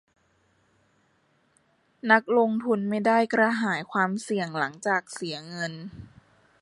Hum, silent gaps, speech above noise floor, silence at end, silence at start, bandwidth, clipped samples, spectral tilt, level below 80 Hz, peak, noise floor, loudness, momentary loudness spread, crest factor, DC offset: none; none; 42 dB; 0.55 s; 2.05 s; 11.5 kHz; under 0.1%; -5 dB/octave; -68 dBFS; -6 dBFS; -67 dBFS; -25 LUFS; 13 LU; 22 dB; under 0.1%